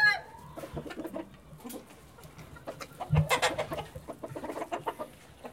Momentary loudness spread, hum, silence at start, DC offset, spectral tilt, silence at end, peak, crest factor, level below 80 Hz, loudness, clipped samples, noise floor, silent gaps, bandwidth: 21 LU; none; 0 s; under 0.1%; -4.5 dB/octave; 0 s; -12 dBFS; 22 dB; -54 dBFS; -34 LUFS; under 0.1%; -52 dBFS; none; 16.5 kHz